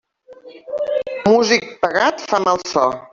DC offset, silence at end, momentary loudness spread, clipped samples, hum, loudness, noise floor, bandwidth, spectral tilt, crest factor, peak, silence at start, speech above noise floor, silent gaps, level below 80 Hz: under 0.1%; 0.05 s; 8 LU; under 0.1%; none; -17 LUFS; -43 dBFS; 7.6 kHz; -3.5 dB/octave; 16 dB; -2 dBFS; 0.3 s; 25 dB; none; -58 dBFS